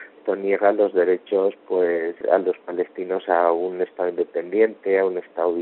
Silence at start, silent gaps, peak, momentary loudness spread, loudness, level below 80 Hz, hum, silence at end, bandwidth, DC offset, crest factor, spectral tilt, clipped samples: 0 s; none; -4 dBFS; 7 LU; -22 LUFS; -74 dBFS; none; 0 s; 4.2 kHz; under 0.1%; 18 dB; -4 dB/octave; under 0.1%